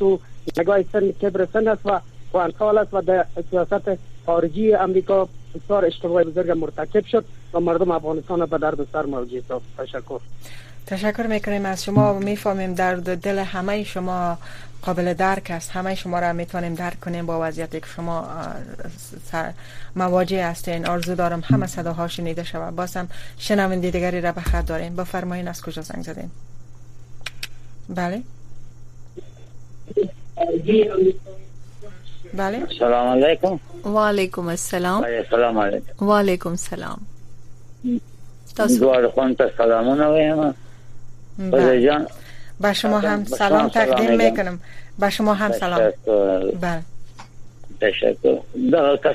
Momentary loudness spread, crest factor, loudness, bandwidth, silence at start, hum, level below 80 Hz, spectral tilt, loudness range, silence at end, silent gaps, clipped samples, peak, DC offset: 15 LU; 18 dB; -21 LUFS; 15 kHz; 0 s; none; -40 dBFS; -6 dB/octave; 9 LU; 0 s; none; under 0.1%; -2 dBFS; under 0.1%